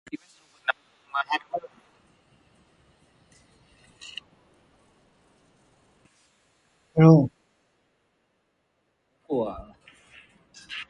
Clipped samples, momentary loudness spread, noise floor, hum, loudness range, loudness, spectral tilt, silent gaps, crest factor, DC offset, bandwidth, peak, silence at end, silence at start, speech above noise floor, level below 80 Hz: under 0.1%; 25 LU; -73 dBFS; none; 13 LU; -24 LUFS; -8 dB/octave; none; 26 dB; under 0.1%; 7.6 kHz; -2 dBFS; 0.05 s; 0.15 s; 53 dB; -60 dBFS